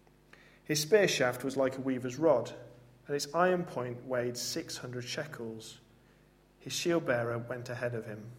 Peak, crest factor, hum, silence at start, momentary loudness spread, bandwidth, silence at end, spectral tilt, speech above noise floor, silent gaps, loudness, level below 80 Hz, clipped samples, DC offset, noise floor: -12 dBFS; 20 dB; 50 Hz at -60 dBFS; 0.7 s; 14 LU; 16 kHz; 0 s; -4 dB/octave; 31 dB; none; -32 LUFS; -70 dBFS; under 0.1%; under 0.1%; -63 dBFS